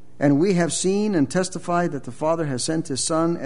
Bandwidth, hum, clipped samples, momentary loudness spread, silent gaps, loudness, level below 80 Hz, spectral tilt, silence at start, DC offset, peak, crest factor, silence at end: 11 kHz; none; under 0.1%; 5 LU; none; -22 LUFS; -58 dBFS; -5 dB/octave; 0.2 s; 1%; -6 dBFS; 16 dB; 0 s